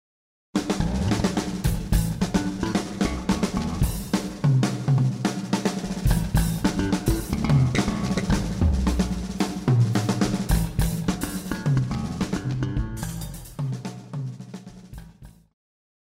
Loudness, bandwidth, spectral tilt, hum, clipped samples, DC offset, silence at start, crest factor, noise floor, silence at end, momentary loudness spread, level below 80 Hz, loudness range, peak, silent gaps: -25 LUFS; 16 kHz; -6 dB/octave; none; under 0.1%; under 0.1%; 0.55 s; 18 dB; -47 dBFS; 0.75 s; 11 LU; -32 dBFS; 6 LU; -8 dBFS; none